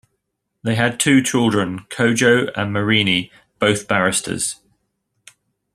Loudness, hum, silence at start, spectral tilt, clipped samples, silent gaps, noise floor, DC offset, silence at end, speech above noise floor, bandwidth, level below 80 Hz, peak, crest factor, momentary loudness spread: -18 LUFS; none; 0.65 s; -4 dB/octave; under 0.1%; none; -75 dBFS; under 0.1%; 1.2 s; 57 dB; 13.5 kHz; -56 dBFS; -2 dBFS; 18 dB; 9 LU